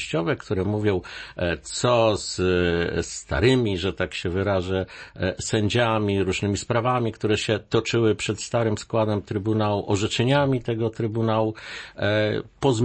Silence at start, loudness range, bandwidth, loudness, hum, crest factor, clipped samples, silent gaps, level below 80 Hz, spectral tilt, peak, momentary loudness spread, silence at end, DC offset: 0 s; 1 LU; 8.8 kHz; -24 LUFS; none; 16 dB; under 0.1%; none; -46 dBFS; -5.5 dB/octave; -6 dBFS; 7 LU; 0 s; under 0.1%